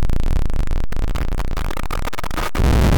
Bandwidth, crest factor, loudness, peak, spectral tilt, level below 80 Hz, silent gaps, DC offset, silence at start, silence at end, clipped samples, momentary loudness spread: 18.5 kHz; 4 dB; -24 LUFS; -10 dBFS; -6 dB/octave; -18 dBFS; none; under 0.1%; 0 s; 0 s; under 0.1%; 7 LU